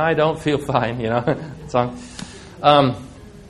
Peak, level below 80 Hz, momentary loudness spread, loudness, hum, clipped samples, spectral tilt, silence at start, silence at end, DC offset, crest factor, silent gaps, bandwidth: 0 dBFS; -46 dBFS; 20 LU; -19 LUFS; none; under 0.1%; -6 dB/octave; 0 s; 0 s; under 0.1%; 20 dB; none; 12.5 kHz